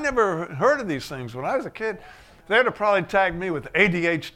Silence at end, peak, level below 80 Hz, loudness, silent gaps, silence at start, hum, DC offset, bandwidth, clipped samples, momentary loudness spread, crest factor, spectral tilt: 0.05 s; -2 dBFS; -50 dBFS; -23 LUFS; none; 0 s; none; under 0.1%; 16 kHz; under 0.1%; 11 LU; 20 dB; -5.5 dB/octave